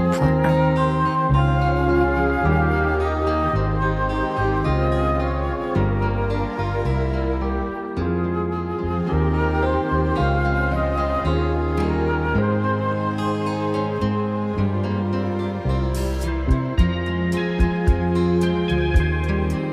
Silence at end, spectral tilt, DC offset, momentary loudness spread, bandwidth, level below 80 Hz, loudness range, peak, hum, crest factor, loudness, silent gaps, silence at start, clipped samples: 0 s; -8 dB/octave; under 0.1%; 5 LU; 12.5 kHz; -28 dBFS; 4 LU; -4 dBFS; none; 16 dB; -21 LUFS; none; 0 s; under 0.1%